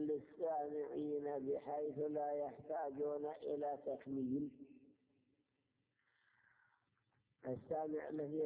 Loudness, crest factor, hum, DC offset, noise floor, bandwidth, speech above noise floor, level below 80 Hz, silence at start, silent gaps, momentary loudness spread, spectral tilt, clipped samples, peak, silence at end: -44 LUFS; 12 dB; none; under 0.1%; -85 dBFS; 4 kHz; 42 dB; -82 dBFS; 0 s; none; 6 LU; -8 dB/octave; under 0.1%; -32 dBFS; 0 s